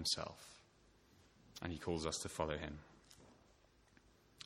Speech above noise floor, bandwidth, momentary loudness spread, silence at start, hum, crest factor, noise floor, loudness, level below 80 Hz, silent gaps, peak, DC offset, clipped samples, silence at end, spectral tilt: 27 dB; 16.5 kHz; 22 LU; 0 s; none; 24 dB; -70 dBFS; -43 LUFS; -62 dBFS; none; -24 dBFS; under 0.1%; under 0.1%; 0 s; -3.5 dB/octave